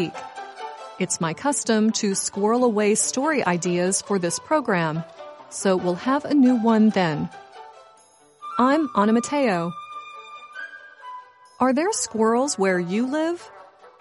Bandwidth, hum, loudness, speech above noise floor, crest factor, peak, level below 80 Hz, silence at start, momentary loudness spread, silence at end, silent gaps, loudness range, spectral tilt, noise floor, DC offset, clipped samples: 11.5 kHz; none; -22 LUFS; 33 dB; 16 dB; -6 dBFS; -68 dBFS; 0 s; 19 LU; 0.1 s; none; 3 LU; -4.5 dB/octave; -54 dBFS; under 0.1%; under 0.1%